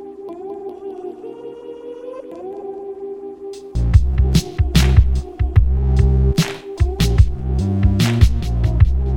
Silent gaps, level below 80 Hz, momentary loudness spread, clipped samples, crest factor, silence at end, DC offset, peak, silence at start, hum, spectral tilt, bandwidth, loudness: none; -20 dBFS; 17 LU; under 0.1%; 16 dB; 0 s; under 0.1%; 0 dBFS; 0 s; none; -6.5 dB/octave; 15.5 kHz; -17 LUFS